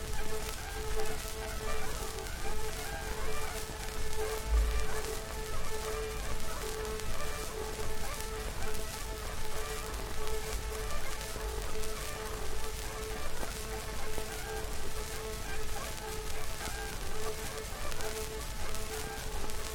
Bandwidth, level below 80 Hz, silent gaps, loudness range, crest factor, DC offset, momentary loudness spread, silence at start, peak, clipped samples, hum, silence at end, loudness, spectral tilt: 18 kHz; -38 dBFS; none; 2 LU; 18 dB; under 0.1%; 2 LU; 0 s; -14 dBFS; under 0.1%; none; 0 s; -39 LUFS; -3 dB/octave